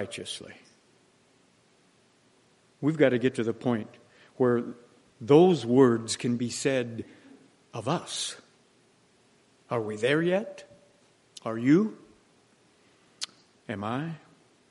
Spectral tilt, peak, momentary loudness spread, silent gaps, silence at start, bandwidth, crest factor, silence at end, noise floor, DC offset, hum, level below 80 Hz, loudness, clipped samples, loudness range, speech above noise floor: -5.5 dB/octave; -6 dBFS; 20 LU; none; 0 s; 11.5 kHz; 24 dB; 0.55 s; -64 dBFS; under 0.1%; none; -74 dBFS; -27 LUFS; under 0.1%; 8 LU; 38 dB